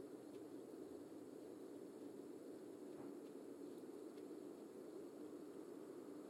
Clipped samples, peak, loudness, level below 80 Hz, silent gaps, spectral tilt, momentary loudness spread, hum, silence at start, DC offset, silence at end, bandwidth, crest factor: under 0.1%; -42 dBFS; -56 LUFS; under -90 dBFS; none; -6 dB/octave; 1 LU; none; 0 s; under 0.1%; 0 s; 16.5 kHz; 12 dB